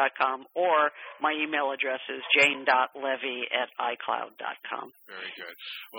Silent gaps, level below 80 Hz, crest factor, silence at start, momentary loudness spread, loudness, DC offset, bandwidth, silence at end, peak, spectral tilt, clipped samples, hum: none; -86 dBFS; 20 dB; 0 s; 17 LU; -27 LUFS; under 0.1%; over 20 kHz; 0 s; -10 dBFS; -2 dB/octave; under 0.1%; none